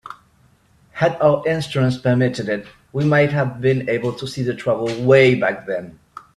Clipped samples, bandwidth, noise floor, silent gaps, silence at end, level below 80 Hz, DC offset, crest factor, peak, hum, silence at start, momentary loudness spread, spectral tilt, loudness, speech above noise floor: under 0.1%; 11.5 kHz; -56 dBFS; none; 0.45 s; -54 dBFS; under 0.1%; 18 dB; 0 dBFS; none; 0.05 s; 13 LU; -7 dB/octave; -18 LUFS; 38 dB